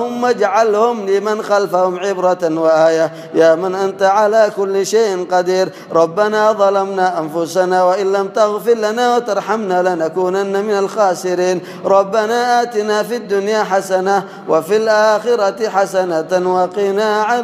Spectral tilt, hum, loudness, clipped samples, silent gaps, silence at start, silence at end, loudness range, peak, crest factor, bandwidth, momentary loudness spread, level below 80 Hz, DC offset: -4.5 dB/octave; none; -15 LUFS; under 0.1%; none; 0 s; 0 s; 2 LU; 0 dBFS; 14 dB; 15.5 kHz; 5 LU; -70 dBFS; under 0.1%